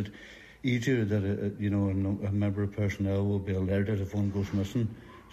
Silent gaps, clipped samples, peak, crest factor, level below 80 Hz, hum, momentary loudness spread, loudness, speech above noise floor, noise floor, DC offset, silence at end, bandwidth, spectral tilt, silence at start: none; under 0.1%; -16 dBFS; 14 dB; -56 dBFS; none; 8 LU; -30 LUFS; 21 dB; -50 dBFS; under 0.1%; 0.05 s; 13 kHz; -8 dB/octave; 0 s